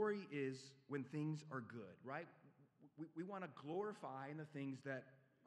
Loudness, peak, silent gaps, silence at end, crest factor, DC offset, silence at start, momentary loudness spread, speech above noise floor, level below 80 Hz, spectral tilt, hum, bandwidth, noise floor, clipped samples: -50 LUFS; -30 dBFS; none; 0.25 s; 20 dB; under 0.1%; 0 s; 10 LU; 21 dB; under -90 dBFS; -7 dB/octave; none; 11 kHz; -70 dBFS; under 0.1%